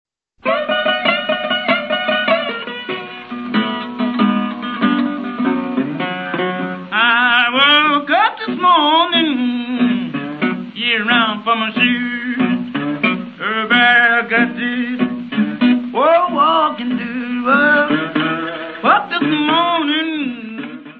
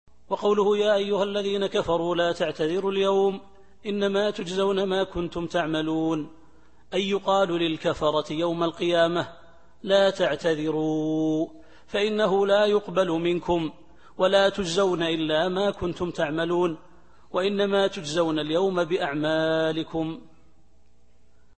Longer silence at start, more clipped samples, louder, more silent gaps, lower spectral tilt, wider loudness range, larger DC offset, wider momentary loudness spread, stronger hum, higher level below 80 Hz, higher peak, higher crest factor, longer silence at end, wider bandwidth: first, 0.45 s vs 0.3 s; neither; first, -15 LUFS vs -25 LUFS; neither; first, -7 dB/octave vs -5.5 dB/octave; first, 6 LU vs 3 LU; second, under 0.1% vs 0.4%; about the same, 10 LU vs 9 LU; neither; second, -64 dBFS vs -54 dBFS; first, 0 dBFS vs -8 dBFS; about the same, 16 dB vs 18 dB; second, 0 s vs 1.4 s; second, 4.9 kHz vs 8.8 kHz